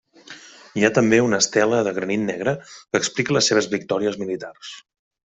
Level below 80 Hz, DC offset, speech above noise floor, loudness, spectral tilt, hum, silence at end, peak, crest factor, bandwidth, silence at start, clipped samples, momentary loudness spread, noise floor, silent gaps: -60 dBFS; under 0.1%; 23 dB; -20 LUFS; -3.5 dB/octave; none; 0.55 s; -2 dBFS; 20 dB; 8.2 kHz; 0.3 s; under 0.1%; 19 LU; -44 dBFS; none